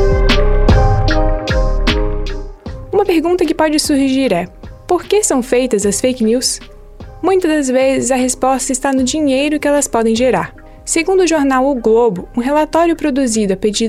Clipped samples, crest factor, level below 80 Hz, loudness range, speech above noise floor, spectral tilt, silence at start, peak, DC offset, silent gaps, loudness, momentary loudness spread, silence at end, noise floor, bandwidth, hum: under 0.1%; 12 dB; -22 dBFS; 2 LU; 20 dB; -4.5 dB/octave; 0 s; -2 dBFS; under 0.1%; none; -14 LUFS; 7 LU; 0 s; -33 dBFS; 14.5 kHz; none